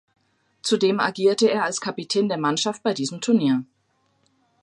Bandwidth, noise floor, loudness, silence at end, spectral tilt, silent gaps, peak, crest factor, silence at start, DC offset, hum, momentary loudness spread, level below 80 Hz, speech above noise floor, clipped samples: 11.5 kHz; -67 dBFS; -22 LUFS; 1 s; -4 dB/octave; none; -6 dBFS; 18 dB; 0.65 s; under 0.1%; none; 6 LU; -74 dBFS; 46 dB; under 0.1%